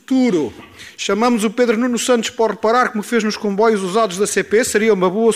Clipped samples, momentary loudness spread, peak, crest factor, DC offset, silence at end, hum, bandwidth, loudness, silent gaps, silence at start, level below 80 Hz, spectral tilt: under 0.1%; 6 LU; -2 dBFS; 14 dB; under 0.1%; 0 s; none; 16 kHz; -16 LUFS; none; 0.1 s; -58 dBFS; -4 dB/octave